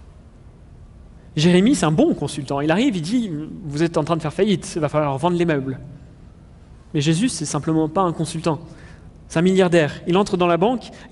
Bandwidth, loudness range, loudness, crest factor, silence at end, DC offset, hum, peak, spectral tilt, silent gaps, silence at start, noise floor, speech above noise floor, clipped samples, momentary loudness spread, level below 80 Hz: 11.5 kHz; 3 LU; -20 LUFS; 18 dB; 0.05 s; under 0.1%; none; -4 dBFS; -6 dB/octave; none; 0 s; -44 dBFS; 25 dB; under 0.1%; 12 LU; -46 dBFS